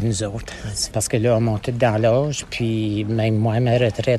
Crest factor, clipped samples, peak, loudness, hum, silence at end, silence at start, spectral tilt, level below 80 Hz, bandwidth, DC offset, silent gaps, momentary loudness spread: 14 dB; under 0.1%; -4 dBFS; -20 LUFS; none; 0 s; 0 s; -5.5 dB/octave; -42 dBFS; 13 kHz; under 0.1%; none; 7 LU